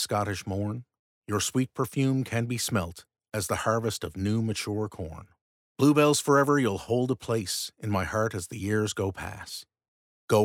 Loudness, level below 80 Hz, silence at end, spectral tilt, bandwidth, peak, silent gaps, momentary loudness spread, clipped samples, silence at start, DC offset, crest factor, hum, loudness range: -28 LUFS; -56 dBFS; 0 s; -5 dB/octave; 17.5 kHz; -10 dBFS; 0.99-1.22 s, 5.41-5.75 s, 9.88-10.28 s; 15 LU; under 0.1%; 0 s; under 0.1%; 18 dB; none; 5 LU